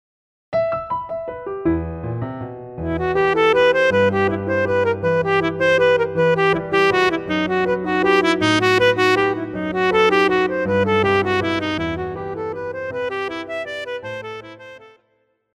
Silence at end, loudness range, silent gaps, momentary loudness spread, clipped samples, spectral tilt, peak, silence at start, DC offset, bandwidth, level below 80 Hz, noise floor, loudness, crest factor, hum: 0.7 s; 8 LU; none; 13 LU; under 0.1%; -5.5 dB/octave; -4 dBFS; 0.5 s; under 0.1%; 12 kHz; -46 dBFS; -65 dBFS; -19 LUFS; 14 dB; none